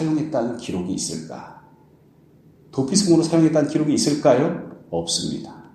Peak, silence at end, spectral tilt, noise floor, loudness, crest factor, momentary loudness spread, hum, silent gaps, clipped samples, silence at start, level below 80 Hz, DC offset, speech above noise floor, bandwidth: -2 dBFS; 0.1 s; -5 dB/octave; -53 dBFS; -20 LUFS; 20 dB; 15 LU; none; none; under 0.1%; 0 s; -56 dBFS; under 0.1%; 33 dB; 13 kHz